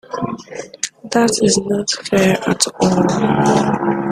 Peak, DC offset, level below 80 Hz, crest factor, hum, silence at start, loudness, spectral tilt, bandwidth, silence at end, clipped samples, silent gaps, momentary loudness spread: 0 dBFS; under 0.1%; -50 dBFS; 16 dB; none; 0.1 s; -16 LUFS; -4.5 dB/octave; 14.5 kHz; 0 s; under 0.1%; none; 11 LU